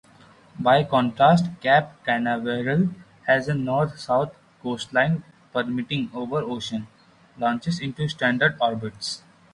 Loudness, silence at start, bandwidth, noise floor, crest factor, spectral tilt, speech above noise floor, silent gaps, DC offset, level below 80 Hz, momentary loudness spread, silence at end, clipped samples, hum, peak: -23 LUFS; 0.55 s; 11.5 kHz; -52 dBFS; 18 dB; -6 dB/octave; 29 dB; none; under 0.1%; -58 dBFS; 12 LU; 0.35 s; under 0.1%; none; -6 dBFS